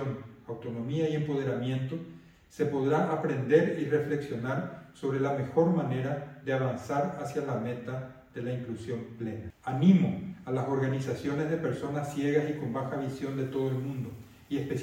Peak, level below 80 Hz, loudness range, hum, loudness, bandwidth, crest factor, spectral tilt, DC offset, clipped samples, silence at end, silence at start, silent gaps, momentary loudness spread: -10 dBFS; -64 dBFS; 4 LU; none; -31 LUFS; 15.5 kHz; 20 dB; -8 dB/octave; under 0.1%; under 0.1%; 0 s; 0 s; none; 13 LU